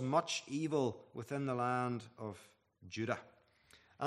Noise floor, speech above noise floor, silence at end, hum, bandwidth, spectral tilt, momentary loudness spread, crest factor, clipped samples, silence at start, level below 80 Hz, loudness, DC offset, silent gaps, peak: -67 dBFS; 29 dB; 0 s; none; 13.5 kHz; -5 dB/octave; 13 LU; 22 dB; under 0.1%; 0 s; -80 dBFS; -39 LUFS; under 0.1%; none; -18 dBFS